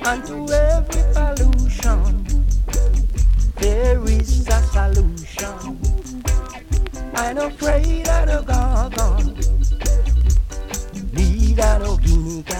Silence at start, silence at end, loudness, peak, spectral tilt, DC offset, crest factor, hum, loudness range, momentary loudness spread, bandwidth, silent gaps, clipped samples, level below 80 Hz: 0 s; 0 s; -20 LUFS; -4 dBFS; -5.5 dB/octave; under 0.1%; 12 dB; none; 3 LU; 7 LU; 15 kHz; none; under 0.1%; -16 dBFS